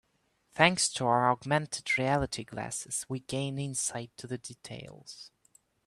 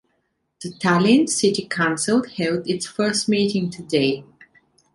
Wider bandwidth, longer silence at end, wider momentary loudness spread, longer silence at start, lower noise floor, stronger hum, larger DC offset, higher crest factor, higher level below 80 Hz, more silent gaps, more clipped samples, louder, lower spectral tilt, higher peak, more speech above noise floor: first, 13 kHz vs 11.5 kHz; about the same, 0.6 s vs 0.7 s; first, 19 LU vs 9 LU; about the same, 0.55 s vs 0.6 s; about the same, -73 dBFS vs -71 dBFS; neither; neither; first, 26 dB vs 18 dB; about the same, -60 dBFS vs -60 dBFS; neither; neither; second, -30 LUFS vs -20 LUFS; about the same, -3.5 dB/octave vs -4.5 dB/octave; about the same, -6 dBFS vs -4 dBFS; second, 42 dB vs 51 dB